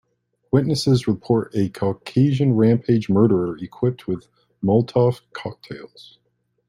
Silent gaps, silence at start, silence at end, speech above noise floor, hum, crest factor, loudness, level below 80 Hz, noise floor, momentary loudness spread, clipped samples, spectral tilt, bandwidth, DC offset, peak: none; 0.55 s; 0.8 s; 42 dB; none; 16 dB; -20 LUFS; -56 dBFS; -62 dBFS; 15 LU; under 0.1%; -8 dB/octave; 12 kHz; under 0.1%; -4 dBFS